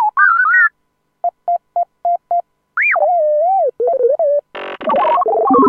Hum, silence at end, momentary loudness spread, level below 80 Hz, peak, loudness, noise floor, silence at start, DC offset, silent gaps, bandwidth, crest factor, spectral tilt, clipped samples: none; 0 s; 11 LU; -62 dBFS; 0 dBFS; -15 LUFS; -66 dBFS; 0 s; under 0.1%; none; 4.8 kHz; 14 dB; -7 dB/octave; under 0.1%